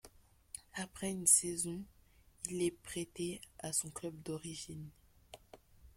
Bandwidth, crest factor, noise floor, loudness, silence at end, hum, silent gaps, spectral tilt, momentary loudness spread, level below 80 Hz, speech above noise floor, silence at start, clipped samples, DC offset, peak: 16.5 kHz; 26 dB; -62 dBFS; -36 LUFS; 0.05 s; none; none; -3 dB/octave; 23 LU; -66 dBFS; 24 dB; 0.05 s; under 0.1%; under 0.1%; -14 dBFS